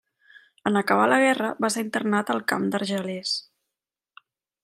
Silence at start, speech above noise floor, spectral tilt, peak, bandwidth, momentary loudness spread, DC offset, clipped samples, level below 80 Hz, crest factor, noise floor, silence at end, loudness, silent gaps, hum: 0.65 s; 63 dB; -4 dB/octave; -4 dBFS; 16 kHz; 9 LU; under 0.1%; under 0.1%; -76 dBFS; 22 dB; -87 dBFS; 1.2 s; -24 LUFS; none; none